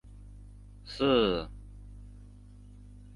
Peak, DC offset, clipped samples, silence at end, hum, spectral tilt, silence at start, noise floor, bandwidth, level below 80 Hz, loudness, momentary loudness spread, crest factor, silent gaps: -12 dBFS; under 0.1%; under 0.1%; 0.2 s; 50 Hz at -45 dBFS; -6.5 dB/octave; 0.05 s; -51 dBFS; 11.5 kHz; -48 dBFS; -28 LUFS; 27 LU; 22 dB; none